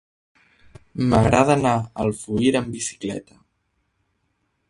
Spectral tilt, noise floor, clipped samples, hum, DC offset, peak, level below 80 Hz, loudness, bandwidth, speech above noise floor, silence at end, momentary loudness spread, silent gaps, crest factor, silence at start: -6 dB/octave; -71 dBFS; under 0.1%; none; under 0.1%; 0 dBFS; -44 dBFS; -21 LUFS; 11.5 kHz; 51 dB; 1.5 s; 14 LU; none; 22 dB; 0.95 s